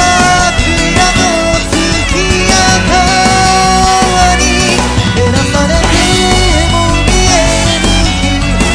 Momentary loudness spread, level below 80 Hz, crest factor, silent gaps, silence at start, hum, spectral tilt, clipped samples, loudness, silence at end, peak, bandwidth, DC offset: 3 LU; -16 dBFS; 8 dB; none; 0 s; none; -3.5 dB/octave; 0.3%; -8 LUFS; 0 s; 0 dBFS; 11 kHz; under 0.1%